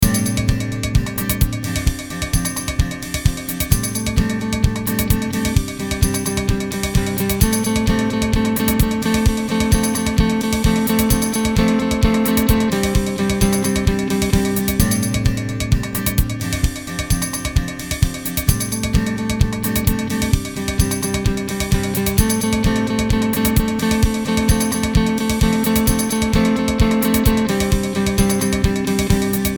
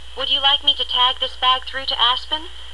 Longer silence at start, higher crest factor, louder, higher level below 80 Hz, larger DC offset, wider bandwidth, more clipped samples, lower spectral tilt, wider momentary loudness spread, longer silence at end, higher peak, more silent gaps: about the same, 0 s vs 0 s; about the same, 18 dB vs 18 dB; about the same, -18 LUFS vs -17 LUFS; first, -24 dBFS vs -42 dBFS; second, under 0.1% vs 2%; first, over 20 kHz vs 12 kHz; neither; first, -5 dB/octave vs -1.5 dB/octave; second, 5 LU vs 8 LU; about the same, 0 s vs 0 s; about the same, 0 dBFS vs -2 dBFS; neither